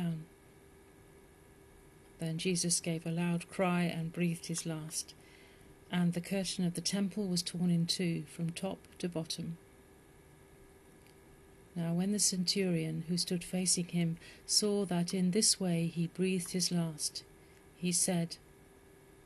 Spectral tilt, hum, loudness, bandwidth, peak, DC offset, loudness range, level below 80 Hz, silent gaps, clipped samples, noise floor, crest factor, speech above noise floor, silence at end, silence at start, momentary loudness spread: -4 dB/octave; none; -34 LUFS; 12.5 kHz; -14 dBFS; under 0.1%; 6 LU; -66 dBFS; none; under 0.1%; -59 dBFS; 22 dB; 26 dB; 0.9 s; 0 s; 11 LU